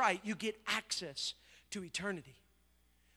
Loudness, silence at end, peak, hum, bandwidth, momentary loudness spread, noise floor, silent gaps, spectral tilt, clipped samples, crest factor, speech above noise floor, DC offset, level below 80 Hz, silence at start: -39 LUFS; 0.85 s; -16 dBFS; none; over 20 kHz; 11 LU; -72 dBFS; none; -2.5 dB/octave; under 0.1%; 24 dB; 32 dB; under 0.1%; -72 dBFS; 0 s